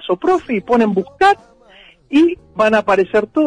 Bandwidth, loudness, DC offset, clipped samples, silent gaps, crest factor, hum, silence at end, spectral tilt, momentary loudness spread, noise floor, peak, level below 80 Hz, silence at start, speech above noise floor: 10.5 kHz; -15 LUFS; under 0.1%; under 0.1%; none; 12 dB; none; 0 s; -6 dB/octave; 4 LU; -46 dBFS; -4 dBFS; -50 dBFS; 0 s; 31 dB